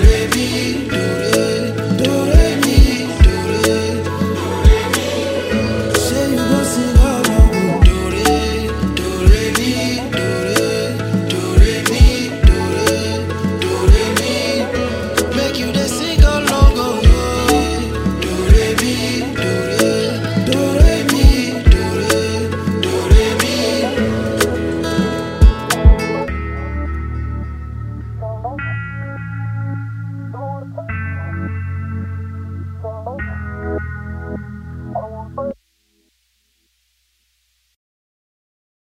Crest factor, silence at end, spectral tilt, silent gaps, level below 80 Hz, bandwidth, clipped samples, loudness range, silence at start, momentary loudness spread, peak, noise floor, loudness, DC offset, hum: 14 dB; 3.35 s; -5 dB/octave; none; -18 dBFS; 16 kHz; 0.2%; 12 LU; 0 s; 14 LU; 0 dBFS; -63 dBFS; -16 LUFS; under 0.1%; none